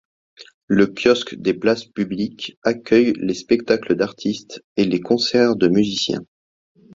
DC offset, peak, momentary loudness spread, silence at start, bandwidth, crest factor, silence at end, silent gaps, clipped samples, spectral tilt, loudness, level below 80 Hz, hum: under 0.1%; -2 dBFS; 9 LU; 0.4 s; 7.8 kHz; 18 dB; 0.7 s; 0.54-0.68 s, 2.57-2.62 s, 4.64-4.76 s; under 0.1%; -5.5 dB/octave; -19 LUFS; -56 dBFS; none